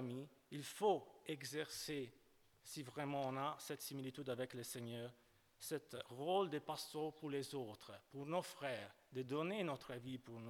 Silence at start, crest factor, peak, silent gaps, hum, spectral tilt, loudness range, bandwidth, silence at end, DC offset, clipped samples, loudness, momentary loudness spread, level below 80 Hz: 0 s; 20 dB; -26 dBFS; none; none; -4.5 dB/octave; 2 LU; 19 kHz; 0 s; under 0.1%; under 0.1%; -46 LUFS; 12 LU; -84 dBFS